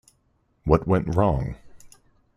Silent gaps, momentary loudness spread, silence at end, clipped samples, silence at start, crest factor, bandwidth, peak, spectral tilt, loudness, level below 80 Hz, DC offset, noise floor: none; 13 LU; 0.5 s; under 0.1%; 0.65 s; 20 dB; 11.5 kHz; -4 dBFS; -9 dB/octave; -23 LUFS; -38 dBFS; under 0.1%; -67 dBFS